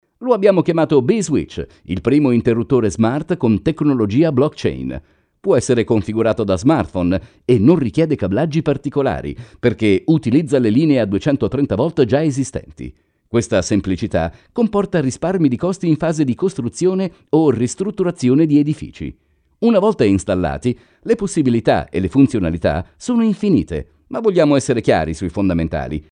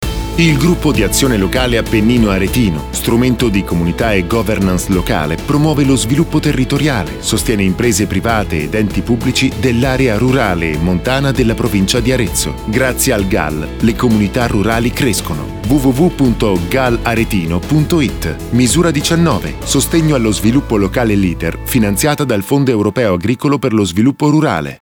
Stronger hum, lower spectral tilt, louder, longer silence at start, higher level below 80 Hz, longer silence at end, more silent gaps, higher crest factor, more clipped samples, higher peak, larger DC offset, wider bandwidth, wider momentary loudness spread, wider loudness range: neither; first, -7 dB/octave vs -5 dB/octave; second, -17 LUFS vs -13 LUFS; first, 0.2 s vs 0 s; second, -40 dBFS vs -26 dBFS; about the same, 0.1 s vs 0.05 s; neither; about the same, 16 dB vs 12 dB; neither; about the same, 0 dBFS vs -2 dBFS; neither; second, 10.5 kHz vs over 20 kHz; first, 9 LU vs 4 LU; about the same, 2 LU vs 1 LU